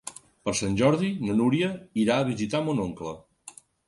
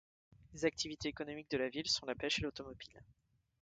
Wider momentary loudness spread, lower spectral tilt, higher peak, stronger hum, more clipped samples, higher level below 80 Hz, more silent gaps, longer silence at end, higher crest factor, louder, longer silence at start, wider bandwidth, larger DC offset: first, 19 LU vs 16 LU; first, -5.5 dB/octave vs -3 dB/octave; first, -10 dBFS vs -20 dBFS; neither; neither; first, -56 dBFS vs -64 dBFS; neither; second, 0.4 s vs 0.6 s; about the same, 18 dB vs 22 dB; first, -26 LUFS vs -39 LUFS; second, 0.05 s vs 0.4 s; first, 11.5 kHz vs 9.4 kHz; neither